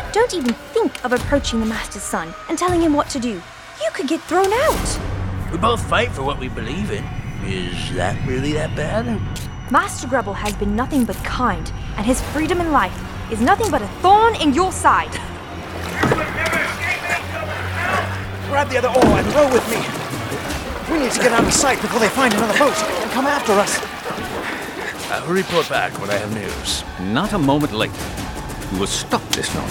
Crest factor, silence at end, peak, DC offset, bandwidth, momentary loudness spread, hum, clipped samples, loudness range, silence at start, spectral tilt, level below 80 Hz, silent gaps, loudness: 18 dB; 0 s; 0 dBFS; under 0.1%; over 20 kHz; 11 LU; none; under 0.1%; 5 LU; 0 s; -4.5 dB/octave; -34 dBFS; none; -19 LUFS